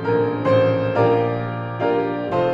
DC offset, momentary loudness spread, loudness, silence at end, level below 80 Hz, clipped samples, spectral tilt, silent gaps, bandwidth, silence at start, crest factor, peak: under 0.1%; 6 LU; -20 LUFS; 0 s; -52 dBFS; under 0.1%; -9 dB/octave; none; 7.2 kHz; 0 s; 14 dB; -6 dBFS